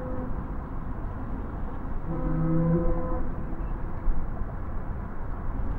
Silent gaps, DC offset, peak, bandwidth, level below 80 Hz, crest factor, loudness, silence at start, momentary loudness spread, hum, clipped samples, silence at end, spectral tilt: none; under 0.1%; -12 dBFS; 2.8 kHz; -30 dBFS; 14 dB; -32 LUFS; 0 s; 11 LU; none; under 0.1%; 0 s; -11.5 dB/octave